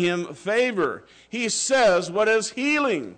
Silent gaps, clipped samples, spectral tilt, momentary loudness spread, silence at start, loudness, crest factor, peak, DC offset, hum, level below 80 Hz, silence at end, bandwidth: none; under 0.1%; -3 dB/octave; 9 LU; 0 s; -22 LUFS; 12 dB; -12 dBFS; under 0.1%; none; -62 dBFS; 0.05 s; 9.4 kHz